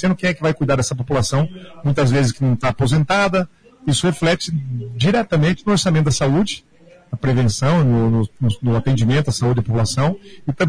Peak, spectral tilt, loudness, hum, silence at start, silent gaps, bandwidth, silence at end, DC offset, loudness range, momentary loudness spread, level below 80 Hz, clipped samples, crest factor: -8 dBFS; -6 dB/octave; -18 LUFS; none; 0 s; none; 11 kHz; 0 s; under 0.1%; 1 LU; 8 LU; -40 dBFS; under 0.1%; 10 dB